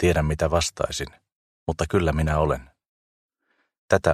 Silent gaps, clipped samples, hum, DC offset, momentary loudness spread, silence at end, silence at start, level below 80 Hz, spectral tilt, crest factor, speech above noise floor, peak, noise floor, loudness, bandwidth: 1.32-1.66 s, 2.88-3.29 s, 3.78-3.89 s; under 0.1%; none; under 0.1%; 9 LU; 0 s; 0 s; -36 dBFS; -5.5 dB/octave; 22 dB; 49 dB; -2 dBFS; -72 dBFS; -24 LUFS; 14.5 kHz